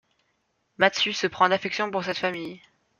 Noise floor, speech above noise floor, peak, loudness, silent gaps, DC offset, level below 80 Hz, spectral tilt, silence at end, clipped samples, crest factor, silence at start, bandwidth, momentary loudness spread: -73 dBFS; 48 dB; -2 dBFS; -24 LUFS; none; under 0.1%; -70 dBFS; -3.5 dB/octave; 0.45 s; under 0.1%; 24 dB; 0.8 s; 7.4 kHz; 8 LU